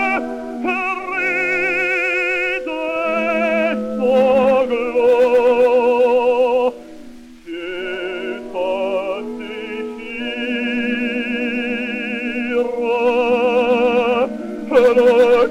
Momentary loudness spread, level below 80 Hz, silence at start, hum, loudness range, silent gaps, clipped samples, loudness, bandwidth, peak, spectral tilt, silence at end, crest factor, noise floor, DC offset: 13 LU; -52 dBFS; 0 s; none; 8 LU; none; under 0.1%; -17 LUFS; 9.6 kHz; 0 dBFS; -5 dB/octave; 0 s; 16 dB; -38 dBFS; under 0.1%